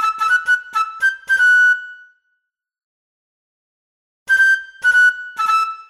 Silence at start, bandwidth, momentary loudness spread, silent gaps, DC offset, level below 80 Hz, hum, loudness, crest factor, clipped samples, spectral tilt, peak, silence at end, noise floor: 0 s; 14 kHz; 7 LU; 2.84-4.26 s; under 0.1%; -62 dBFS; none; -14 LUFS; 12 dB; under 0.1%; 2.5 dB/octave; -6 dBFS; 0.1 s; -72 dBFS